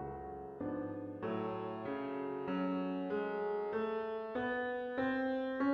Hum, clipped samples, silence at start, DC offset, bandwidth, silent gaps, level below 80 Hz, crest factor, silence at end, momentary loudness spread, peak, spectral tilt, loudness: none; under 0.1%; 0 s; under 0.1%; 5.6 kHz; none; -68 dBFS; 14 dB; 0 s; 6 LU; -24 dBFS; -8.5 dB/octave; -39 LUFS